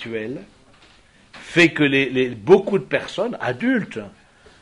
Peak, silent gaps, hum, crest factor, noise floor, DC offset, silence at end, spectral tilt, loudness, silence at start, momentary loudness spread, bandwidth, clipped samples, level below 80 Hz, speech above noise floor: -2 dBFS; none; none; 20 dB; -52 dBFS; under 0.1%; 0.5 s; -5.5 dB/octave; -19 LUFS; 0 s; 17 LU; 11 kHz; under 0.1%; -56 dBFS; 32 dB